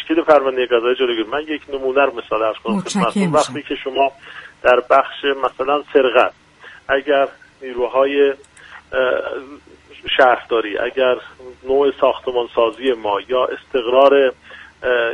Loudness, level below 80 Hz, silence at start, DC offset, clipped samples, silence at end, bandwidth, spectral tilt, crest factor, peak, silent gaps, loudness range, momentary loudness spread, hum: -17 LUFS; -52 dBFS; 0 s; under 0.1%; under 0.1%; 0 s; 11.5 kHz; -4.5 dB/octave; 18 dB; 0 dBFS; none; 2 LU; 11 LU; none